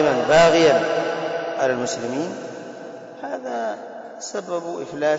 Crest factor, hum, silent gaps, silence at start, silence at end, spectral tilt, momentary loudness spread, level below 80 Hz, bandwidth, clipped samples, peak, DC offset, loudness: 14 dB; none; none; 0 s; 0 s; -4 dB/octave; 20 LU; -56 dBFS; 8 kHz; under 0.1%; -6 dBFS; under 0.1%; -21 LUFS